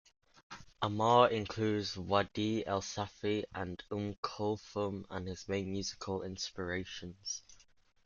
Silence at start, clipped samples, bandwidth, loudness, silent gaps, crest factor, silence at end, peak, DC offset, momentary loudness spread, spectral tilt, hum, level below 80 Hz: 0.5 s; under 0.1%; 7.4 kHz; -36 LUFS; 4.18-4.23 s; 24 dB; 0.5 s; -12 dBFS; under 0.1%; 13 LU; -5 dB/octave; none; -66 dBFS